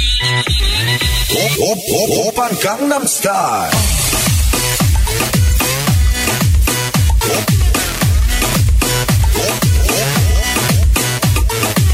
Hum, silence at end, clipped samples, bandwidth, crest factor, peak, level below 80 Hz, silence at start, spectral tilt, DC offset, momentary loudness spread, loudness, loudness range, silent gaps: none; 0 s; under 0.1%; 16.5 kHz; 12 dB; -2 dBFS; -18 dBFS; 0 s; -3.5 dB/octave; under 0.1%; 2 LU; -13 LUFS; 1 LU; none